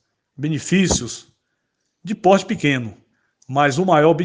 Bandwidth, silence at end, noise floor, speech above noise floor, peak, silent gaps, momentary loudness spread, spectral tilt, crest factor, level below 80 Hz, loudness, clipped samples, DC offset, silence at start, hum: 10 kHz; 0 s; -73 dBFS; 56 dB; 0 dBFS; none; 16 LU; -5 dB/octave; 20 dB; -44 dBFS; -18 LUFS; under 0.1%; under 0.1%; 0.4 s; none